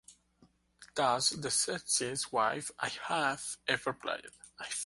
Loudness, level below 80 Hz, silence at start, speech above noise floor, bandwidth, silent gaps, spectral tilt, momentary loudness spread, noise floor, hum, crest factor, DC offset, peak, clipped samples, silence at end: -33 LUFS; -72 dBFS; 0.1 s; 34 dB; 12 kHz; none; -1.5 dB/octave; 11 LU; -68 dBFS; none; 22 dB; under 0.1%; -14 dBFS; under 0.1%; 0 s